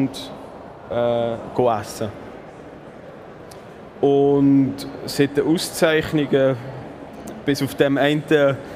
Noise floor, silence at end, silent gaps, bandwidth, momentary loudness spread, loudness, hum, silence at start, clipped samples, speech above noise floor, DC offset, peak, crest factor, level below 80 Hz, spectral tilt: -39 dBFS; 0 s; none; 15.5 kHz; 22 LU; -20 LUFS; none; 0 s; under 0.1%; 20 dB; under 0.1%; -2 dBFS; 18 dB; -52 dBFS; -6 dB/octave